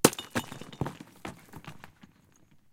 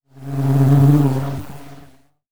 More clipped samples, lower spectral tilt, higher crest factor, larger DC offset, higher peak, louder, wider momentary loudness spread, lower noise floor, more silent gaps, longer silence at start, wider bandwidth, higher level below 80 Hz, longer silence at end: neither; second, -3.5 dB/octave vs -9 dB/octave; first, 32 dB vs 16 dB; neither; about the same, -2 dBFS vs -2 dBFS; second, -35 LUFS vs -16 LUFS; about the same, 15 LU vs 17 LU; first, -61 dBFS vs -49 dBFS; neither; about the same, 0.05 s vs 0 s; second, 16.5 kHz vs 18.5 kHz; second, -60 dBFS vs -48 dBFS; first, 0.85 s vs 0 s